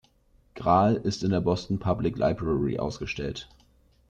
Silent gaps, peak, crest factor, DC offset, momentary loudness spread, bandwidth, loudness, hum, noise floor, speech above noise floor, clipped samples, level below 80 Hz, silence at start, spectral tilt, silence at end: none; -10 dBFS; 18 dB; under 0.1%; 10 LU; 9 kHz; -27 LUFS; none; -62 dBFS; 36 dB; under 0.1%; -48 dBFS; 0.55 s; -7 dB/octave; 0.65 s